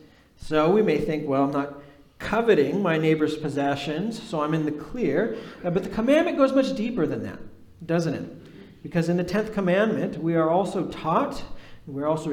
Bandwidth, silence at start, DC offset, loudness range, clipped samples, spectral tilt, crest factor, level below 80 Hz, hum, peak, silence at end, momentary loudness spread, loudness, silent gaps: 15 kHz; 0.4 s; under 0.1%; 3 LU; under 0.1%; -7 dB/octave; 18 dB; -50 dBFS; none; -6 dBFS; 0 s; 13 LU; -24 LUFS; none